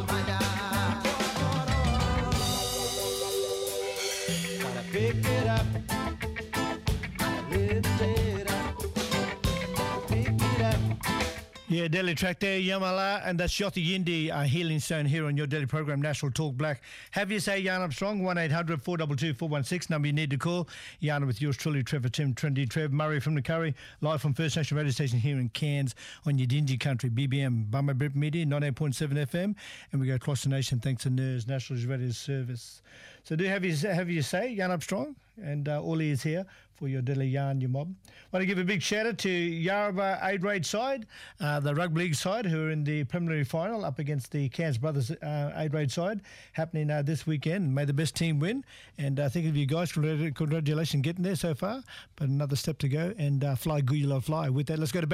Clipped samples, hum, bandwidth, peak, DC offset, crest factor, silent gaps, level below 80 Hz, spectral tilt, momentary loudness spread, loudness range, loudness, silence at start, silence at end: under 0.1%; none; 16 kHz; -16 dBFS; under 0.1%; 14 dB; none; -46 dBFS; -5.5 dB/octave; 6 LU; 3 LU; -30 LUFS; 0 s; 0 s